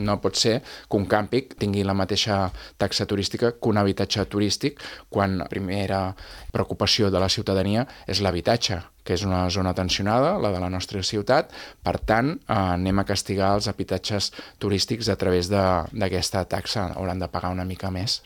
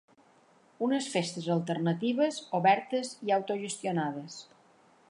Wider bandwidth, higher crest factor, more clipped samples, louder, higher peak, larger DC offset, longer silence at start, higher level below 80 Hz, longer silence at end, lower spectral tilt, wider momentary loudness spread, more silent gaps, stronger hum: first, 18 kHz vs 11.5 kHz; about the same, 20 dB vs 22 dB; neither; first, -24 LUFS vs -30 LUFS; first, -4 dBFS vs -10 dBFS; neither; second, 0 s vs 0.8 s; first, -46 dBFS vs -82 dBFS; second, 0.05 s vs 0.65 s; about the same, -5 dB/octave vs -5 dB/octave; about the same, 7 LU vs 9 LU; neither; neither